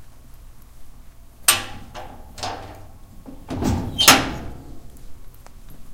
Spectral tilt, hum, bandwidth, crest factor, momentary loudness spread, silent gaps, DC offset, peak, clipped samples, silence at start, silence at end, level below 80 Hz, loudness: -2 dB/octave; none; 17 kHz; 24 dB; 27 LU; none; under 0.1%; 0 dBFS; under 0.1%; 0 s; 0 s; -40 dBFS; -18 LUFS